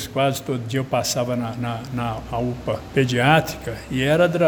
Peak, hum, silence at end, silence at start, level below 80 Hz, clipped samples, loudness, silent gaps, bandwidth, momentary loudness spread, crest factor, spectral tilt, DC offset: -2 dBFS; none; 0 s; 0 s; -44 dBFS; under 0.1%; -22 LUFS; none; over 20 kHz; 10 LU; 20 dB; -5 dB/octave; under 0.1%